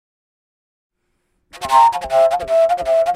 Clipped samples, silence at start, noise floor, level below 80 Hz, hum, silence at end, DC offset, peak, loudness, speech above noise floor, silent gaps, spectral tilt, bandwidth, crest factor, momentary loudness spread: under 0.1%; 1.55 s; -68 dBFS; -50 dBFS; none; 0 s; under 0.1%; -2 dBFS; -15 LUFS; 54 dB; none; -2.5 dB/octave; 14.5 kHz; 16 dB; 3 LU